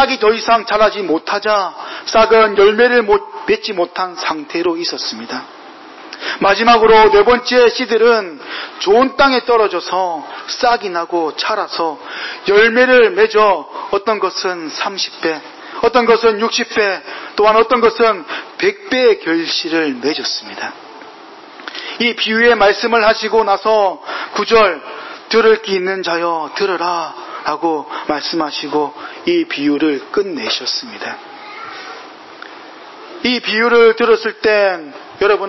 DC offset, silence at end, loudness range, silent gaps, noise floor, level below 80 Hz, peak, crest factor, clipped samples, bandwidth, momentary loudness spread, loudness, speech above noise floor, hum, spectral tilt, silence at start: under 0.1%; 0 s; 7 LU; none; -36 dBFS; -50 dBFS; -2 dBFS; 14 dB; under 0.1%; 6.2 kHz; 16 LU; -14 LUFS; 23 dB; none; -3.5 dB/octave; 0 s